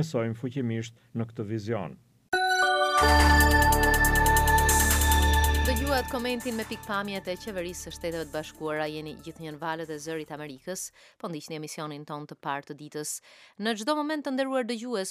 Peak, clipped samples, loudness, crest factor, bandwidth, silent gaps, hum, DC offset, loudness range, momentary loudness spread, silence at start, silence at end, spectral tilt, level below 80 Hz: -6 dBFS; under 0.1%; -26 LUFS; 20 dB; 16 kHz; none; none; under 0.1%; 15 LU; 17 LU; 0 s; 0 s; -4 dB/octave; -32 dBFS